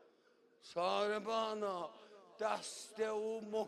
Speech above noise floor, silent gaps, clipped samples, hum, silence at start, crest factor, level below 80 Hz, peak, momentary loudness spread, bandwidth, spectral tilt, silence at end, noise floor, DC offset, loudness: 31 dB; none; under 0.1%; none; 0.65 s; 18 dB; -84 dBFS; -24 dBFS; 11 LU; 13 kHz; -3 dB/octave; 0 s; -71 dBFS; under 0.1%; -40 LUFS